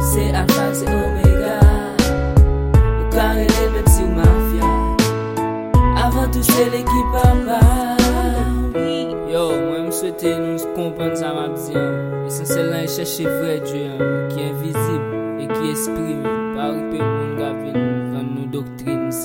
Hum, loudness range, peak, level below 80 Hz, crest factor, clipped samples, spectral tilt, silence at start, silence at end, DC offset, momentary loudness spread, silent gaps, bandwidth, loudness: none; 6 LU; 0 dBFS; -22 dBFS; 16 dB; under 0.1%; -6 dB/octave; 0 s; 0 s; under 0.1%; 9 LU; none; 17 kHz; -18 LUFS